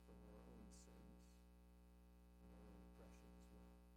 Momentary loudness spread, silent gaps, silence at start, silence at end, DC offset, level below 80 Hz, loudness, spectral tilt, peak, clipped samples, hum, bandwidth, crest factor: 4 LU; none; 0 s; 0 s; under 0.1%; -68 dBFS; -66 LUFS; -6 dB/octave; -52 dBFS; under 0.1%; 60 Hz at -65 dBFS; 16.5 kHz; 12 dB